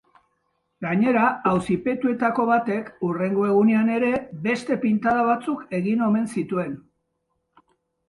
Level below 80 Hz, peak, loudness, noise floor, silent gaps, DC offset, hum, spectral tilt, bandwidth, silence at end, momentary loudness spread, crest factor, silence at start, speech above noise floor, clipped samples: -60 dBFS; -8 dBFS; -22 LUFS; -75 dBFS; none; under 0.1%; none; -7.5 dB/octave; 11.5 kHz; 1.3 s; 8 LU; 16 dB; 0.8 s; 53 dB; under 0.1%